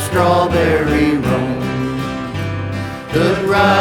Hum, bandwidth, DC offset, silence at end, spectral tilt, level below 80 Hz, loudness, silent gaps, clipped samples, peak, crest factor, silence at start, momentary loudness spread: none; 19 kHz; under 0.1%; 0 s; -6 dB/octave; -34 dBFS; -16 LUFS; none; under 0.1%; 0 dBFS; 16 dB; 0 s; 9 LU